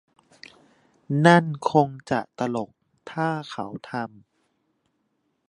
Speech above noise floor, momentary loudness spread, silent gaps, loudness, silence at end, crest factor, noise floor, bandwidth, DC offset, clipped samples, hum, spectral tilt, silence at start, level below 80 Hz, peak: 50 dB; 17 LU; none; -24 LUFS; 1.4 s; 24 dB; -73 dBFS; 11 kHz; under 0.1%; under 0.1%; none; -6.5 dB/octave; 1.1 s; -68 dBFS; -2 dBFS